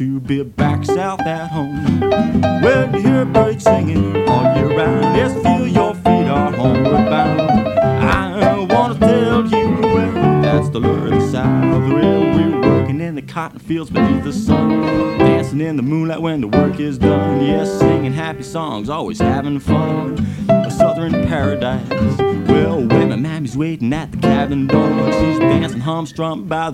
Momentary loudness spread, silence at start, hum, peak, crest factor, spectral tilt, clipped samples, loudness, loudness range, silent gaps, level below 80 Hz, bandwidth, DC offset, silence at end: 7 LU; 0 s; none; 0 dBFS; 14 dB; -7.5 dB/octave; under 0.1%; -15 LUFS; 3 LU; none; -36 dBFS; 14 kHz; under 0.1%; 0 s